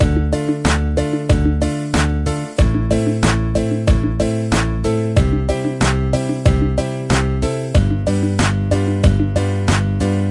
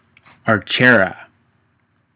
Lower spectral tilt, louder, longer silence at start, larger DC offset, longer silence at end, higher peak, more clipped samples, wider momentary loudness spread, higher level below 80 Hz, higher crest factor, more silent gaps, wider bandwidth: second, -6.5 dB/octave vs -9 dB/octave; about the same, -17 LUFS vs -15 LUFS; second, 0 s vs 0.45 s; neither; second, 0 s vs 1 s; about the same, 0 dBFS vs 0 dBFS; neither; second, 3 LU vs 11 LU; first, -22 dBFS vs -54 dBFS; about the same, 16 dB vs 18 dB; neither; first, 11.5 kHz vs 4 kHz